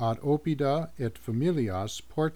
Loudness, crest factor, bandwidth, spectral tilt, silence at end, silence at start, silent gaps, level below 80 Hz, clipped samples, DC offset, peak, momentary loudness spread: -29 LUFS; 12 dB; 19 kHz; -7 dB/octave; 0 s; 0 s; none; -56 dBFS; under 0.1%; 0.5%; -16 dBFS; 7 LU